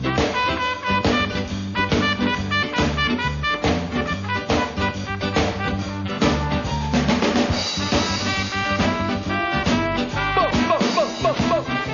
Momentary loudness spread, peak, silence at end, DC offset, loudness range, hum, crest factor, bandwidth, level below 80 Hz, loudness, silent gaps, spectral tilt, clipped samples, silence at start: 5 LU; -6 dBFS; 0 s; under 0.1%; 2 LU; none; 16 dB; 7.4 kHz; -36 dBFS; -21 LUFS; none; -5 dB/octave; under 0.1%; 0 s